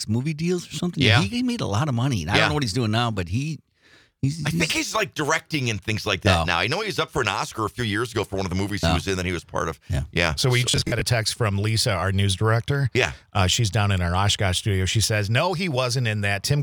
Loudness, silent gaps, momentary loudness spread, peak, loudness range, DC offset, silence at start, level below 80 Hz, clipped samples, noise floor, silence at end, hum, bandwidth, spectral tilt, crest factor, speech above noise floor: -23 LUFS; none; 7 LU; -2 dBFS; 3 LU; under 0.1%; 0 s; -44 dBFS; under 0.1%; -56 dBFS; 0 s; none; 19.5 kHz; -4.5 dB/octave; 20 dB; 34 dB